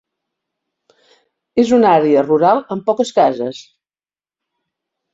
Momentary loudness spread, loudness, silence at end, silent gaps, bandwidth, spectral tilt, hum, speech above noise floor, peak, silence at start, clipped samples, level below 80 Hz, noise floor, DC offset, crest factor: 12 LU; -14 LUFS; 1.55 s; none; 7.8 kHz; -6 dB/octave; none; over 77 dB; -2 dBFS; 1.55 s; under 0.1%; -60 dBFS; under -90 dBFS; under 0.1%; 16 dB